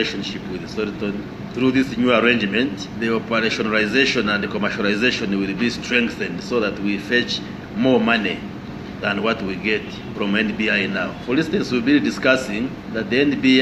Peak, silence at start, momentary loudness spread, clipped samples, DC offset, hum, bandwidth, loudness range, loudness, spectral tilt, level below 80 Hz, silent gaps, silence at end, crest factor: 0 dBFS; 0 s; 10 LU; under 0.1%; under 0.1%; none; 12 kHz; 3 LU; -20 LUFS; -5 dB/octave; -48 dBFS; none; 0 s; 20 dB